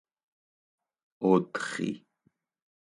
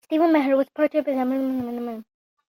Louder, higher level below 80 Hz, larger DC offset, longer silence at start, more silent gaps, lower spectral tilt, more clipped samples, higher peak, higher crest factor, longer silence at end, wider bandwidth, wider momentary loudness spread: second, -29 LUFS vs -23 LUFS; second, -76 dBFS vs -68 dBFS; neither; first, 1.2 s vs 0.1 s; neither; about the same, -6 dB/octave vs -6.5 dB/octave; neither; about the same, -10 dBFS vs -8 dBFS; first, 24 dB vs 14 dB; first, 1 s vs 0.45 s; second, 11.5 kHz vs 16.5 kHz; second, 10 LU vs 13 LU